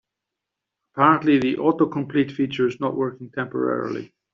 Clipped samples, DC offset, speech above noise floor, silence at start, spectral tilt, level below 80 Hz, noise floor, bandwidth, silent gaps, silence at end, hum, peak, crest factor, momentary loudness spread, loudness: under 0.1%; under 0.1%; 63 dB; 0.95 s; -5 dB/octave; -64 dBFS; -84 dBFS; 7.2 kHz; none; 0.3 s; none; -4 dBFS; 20 dB; 12 LU; -22 LUFS